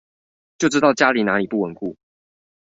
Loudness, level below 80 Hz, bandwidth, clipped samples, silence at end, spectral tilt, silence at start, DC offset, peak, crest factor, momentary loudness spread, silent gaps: -19 LUFS; -62 dBFS; 8 kHz; under 0.1%; 0.8 s; -4.5 dB/octave; 0.6 s; under 0.1%; -2 dBFS; 20 dB; 14 LU; none